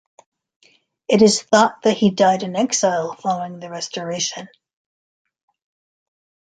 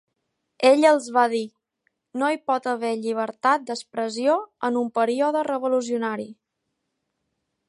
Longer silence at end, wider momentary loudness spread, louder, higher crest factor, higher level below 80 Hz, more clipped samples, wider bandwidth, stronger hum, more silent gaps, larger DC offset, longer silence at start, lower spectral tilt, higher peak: first, 1.95 s vs 1.35 s; first, 14 LU vs 11 LU; first, -18 LUFS vs -23 LUFS; about the same, 20 dB vs 20 dB; first, -62 dBFS vs -80 dBFS; neither; second, 9.4 kHz vs 11.5 kHz; neither; neither; neither; first, 1.1 s vs 0.6 s; about the same, -4 dB/octave vs -4 dB/octave; about the same, -2 dBFS vs -4 dBFS